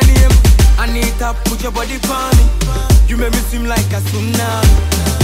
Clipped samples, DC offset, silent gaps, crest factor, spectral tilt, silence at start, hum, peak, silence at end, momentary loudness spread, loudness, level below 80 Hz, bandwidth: under 0.1%; under 0.1%; none; 10 dB; -5 dB/octave; 0 s; none; 0 dBFS; 0 s; 8 LU; -14 LUFS; -12 dBFS; 16.5 kHz